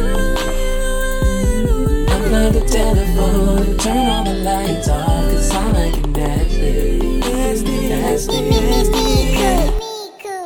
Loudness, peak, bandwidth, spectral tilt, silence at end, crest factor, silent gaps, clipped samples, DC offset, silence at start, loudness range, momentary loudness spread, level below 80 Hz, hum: -17 LUFS; -2 dBFS; 19 kHz; -5 dB/octave; 0 s; 14 dB; none; under 0.1%; under 0.1%; 0 s; 2 LU; 5 LU; -18 dBFS; none